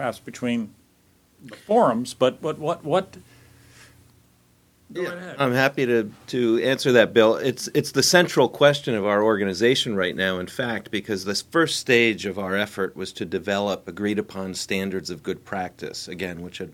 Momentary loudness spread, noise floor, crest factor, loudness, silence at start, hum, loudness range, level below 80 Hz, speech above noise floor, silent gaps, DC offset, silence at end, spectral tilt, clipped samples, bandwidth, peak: 13 LU; -60 dBFS; 22 dB; -22 LUFS; 0 s; 60 Hz at -55 dBFS; 9 LU; -62 dBFS; 37 dB; none; under 0.1%; 0 s; -4 dB/octave; under 0.1%; 17 kHz; 0 dBFS